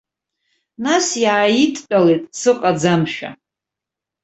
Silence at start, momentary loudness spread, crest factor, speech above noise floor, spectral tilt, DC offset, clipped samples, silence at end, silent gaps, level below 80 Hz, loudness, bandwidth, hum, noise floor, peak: 0.8 s; 10 LU; 16 dB; 69 dB; -4.5 dB/octave; under 0.1%; under 0.1%; 0.9 s; none; -60 dBFS; -16 LUFS; 8.2 kHz; none; -85 dBFS; -2 dBFS